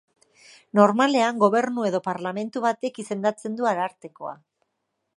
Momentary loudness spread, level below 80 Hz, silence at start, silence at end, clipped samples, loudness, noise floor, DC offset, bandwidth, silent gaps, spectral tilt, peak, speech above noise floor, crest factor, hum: 13 LU; -78 dBFS; 0.75 s; 0.85 s; under 0.1%; -23 LUFS; -78 dBFS; under 0.1%; 11.5 kHz; none; -5.5 dB/octave; -2 dBFS; 55 dB; 22 dB; none